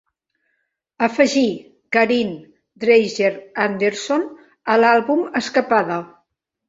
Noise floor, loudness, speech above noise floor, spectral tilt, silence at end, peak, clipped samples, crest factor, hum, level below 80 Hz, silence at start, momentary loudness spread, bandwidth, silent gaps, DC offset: -72 dBFS; -18 LUFS; 54 dB; -4.5 dB/octave; 0.6 s; -2 dBFS; under 0.1%; 18 dB; none; -64 dBFS; 1 s; 12 LU; 8 kHz; none; under 0.1%